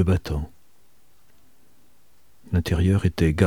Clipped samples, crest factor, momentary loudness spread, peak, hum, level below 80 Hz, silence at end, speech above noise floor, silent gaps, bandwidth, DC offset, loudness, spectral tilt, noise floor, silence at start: under 0.1%; 22 dB; 10 LU; -2 dBFS; none; -36 dBFS; 0 s; 42 dB; none; 14.5 kHz; 0.5%; -23 LUFS; -7.5 dB/octave; -63 dBFS; 0 s